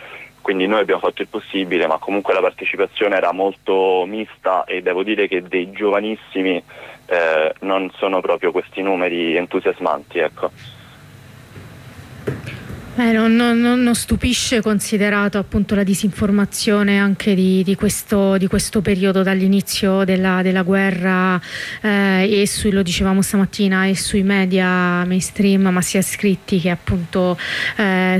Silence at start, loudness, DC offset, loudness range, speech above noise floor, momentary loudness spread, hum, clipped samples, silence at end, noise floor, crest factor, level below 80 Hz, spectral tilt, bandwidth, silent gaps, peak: 0 s; -17 LUFS; under 0.1%; 4 LU; 24 dB; 7 LU; none; under 0.1%; 0 s; -41 dBFS; 12 dB; -42 dBFS; -5 dB/octave; 15 kHz; none; -6 dBFS